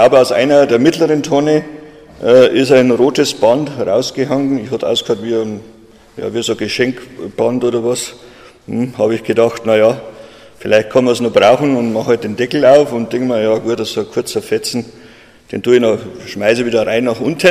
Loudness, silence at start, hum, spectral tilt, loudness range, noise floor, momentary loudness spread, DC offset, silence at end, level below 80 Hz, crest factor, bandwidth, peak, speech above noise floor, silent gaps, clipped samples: -13 LUFS; 0 s; none; -5 dB/octave; 6 LU; -41 dBFS; 12 LU; under 0.1%; 0 s; -52 dBFS; 14 dB; 15 kHz; 0 dBFS; 28 dB; none; under 0.1%